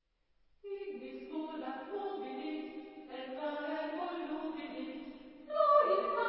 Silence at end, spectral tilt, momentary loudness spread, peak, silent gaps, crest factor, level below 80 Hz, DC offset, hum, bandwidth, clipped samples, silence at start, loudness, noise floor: 0 s; -1 dB/octave; 19 LU; -16 dBFS; none; 22 dB; -76 dBFS; under 0.1%; none; 5.6 kHz; under 0.1%; 0.65 s; -37 LUFS; -73 dBFS